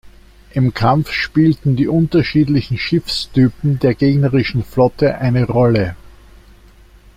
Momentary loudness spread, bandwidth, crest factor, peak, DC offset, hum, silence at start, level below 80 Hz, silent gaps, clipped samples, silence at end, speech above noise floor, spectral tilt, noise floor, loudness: 4 LU; 15 kHz; 14 dB; -2 dBFS; under 0.1%; none; 0.05 s; -38 dBFS; none; under 0.1%; 1.1 s; 30 dB; -7.5 dB/octave; -44 dBFS; -15 LUFS